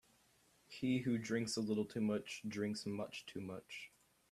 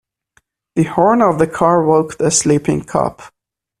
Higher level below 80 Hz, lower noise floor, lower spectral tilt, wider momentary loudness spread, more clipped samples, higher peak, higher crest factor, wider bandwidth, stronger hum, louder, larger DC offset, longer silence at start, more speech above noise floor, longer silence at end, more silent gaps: second, -76 dBFS vs -48 dBFS; first, -73 dBFS vs -59 dBFS; about the same, -5 dB/octave vs -5 dB/octave; first, 12 LU vs 7 LU; neither; second, -26 dBFS vs 0 dBFS; about the same, 16 dB vs 16 dB; about the same, 14 kHz vs 14 kHz; neither; second, -41 LUFS vs -14 LUFS; neither; about the same, 0.7 s vs 0.75 s; second, 32 dB vs 45 dB; about the same, 0.45 s vs 0.5 s; neither